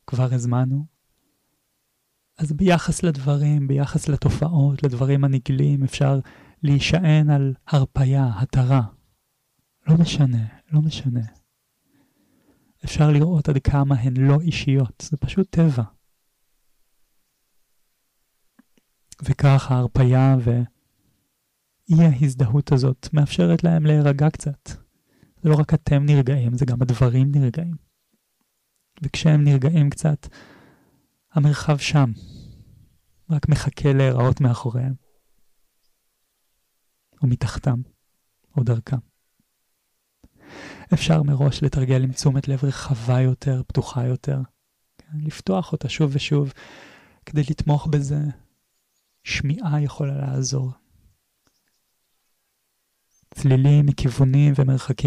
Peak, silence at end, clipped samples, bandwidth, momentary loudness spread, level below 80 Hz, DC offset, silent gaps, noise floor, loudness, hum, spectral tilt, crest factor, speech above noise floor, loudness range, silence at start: -8 dBFS; 0 s; under 0.1%; 11 kHz; 12 LU; -42 dBFS; under 0.1%; none; -72 dBFS; -20 LUFS; none; -7 dB/octave; 12 dB; 53 dB; 7 LU; 0.1 s